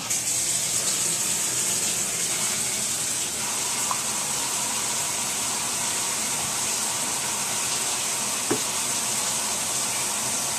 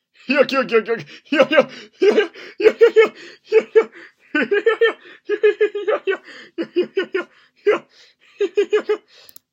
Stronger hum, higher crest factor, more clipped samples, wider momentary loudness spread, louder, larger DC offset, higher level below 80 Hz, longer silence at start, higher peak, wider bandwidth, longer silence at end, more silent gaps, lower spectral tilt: neither; about the same, 16 dB vs 18 dB; neither; second, 2 LU vs 12 LU; second, -23 LUFS vs -18 LUFS; neither; first, -62 dBFS vs -74 dBFS; second, 0 s vs 0.3 s; second, -10 dBFS vs 0 dBFS; second, 14.5 kHz vs 16 kHz; second, 0 s vs 0.55 s; neither; second, 0 dB/octave vs -4.5 dB/octave